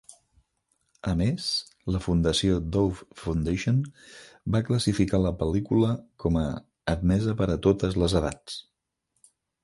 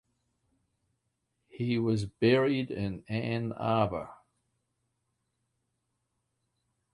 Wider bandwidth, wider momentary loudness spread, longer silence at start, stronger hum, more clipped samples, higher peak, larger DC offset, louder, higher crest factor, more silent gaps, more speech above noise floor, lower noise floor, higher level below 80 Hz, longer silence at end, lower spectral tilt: about the same, 11.5 kHz vs 11 kHz; about the same, 12 LU vs 11 LU; second, 0.1 s vs 1.55 s; neither; neither; first, -8 dBFS vs -12 dBFS; neither; first, -26 LUFS vs -30 LUFS; about the same, 18 dB vs 22 dB; neither; about the same, 52 dB vs 51 dB; second, -77 dBFS vs -81 dBFS; first, -40 dBFS vs -60 dBFS; second, 1 s vs 2.8 s; about the same, -6.5 dB/octave vs -7.5 dB/octave